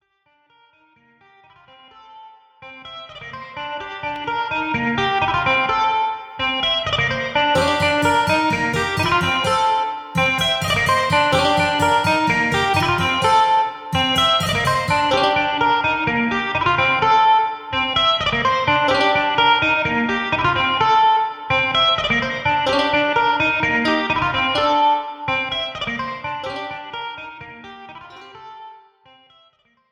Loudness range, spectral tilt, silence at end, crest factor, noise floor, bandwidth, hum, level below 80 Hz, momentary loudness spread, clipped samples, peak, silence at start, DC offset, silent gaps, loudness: 11 LU; -4 dB/octave; 1.15 s; 16 dB; -62 dBFS; 16 kHz; none; -46 dBFS; 14 LU; under 0.1%; -4 dBFS; 2.1 s; under 0.1%; none; -17 LUFS